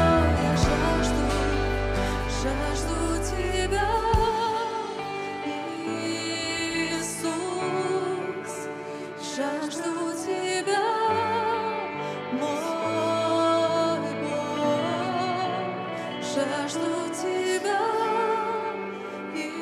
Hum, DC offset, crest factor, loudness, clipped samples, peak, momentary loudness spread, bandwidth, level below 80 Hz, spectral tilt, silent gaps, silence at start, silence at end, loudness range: none; under 0.1%; 16 dB; -27 LUFS; under 0.1%; -10 dBFS; 9 LU; 15 kHz; -38 dBFS; -4.5 dB/octave; none; 0 s; 0 s; 3 LU